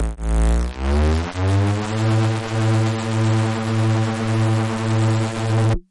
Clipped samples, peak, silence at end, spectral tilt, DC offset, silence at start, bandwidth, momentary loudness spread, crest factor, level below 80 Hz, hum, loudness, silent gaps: under 0.1%; -8 dBFS; 0.1 s; -6.5 dB/octave; under 0.1%; 0 s; 11 kHz; 2 LU; 10 dB; -26 dBFS; none; -20 LUFS; none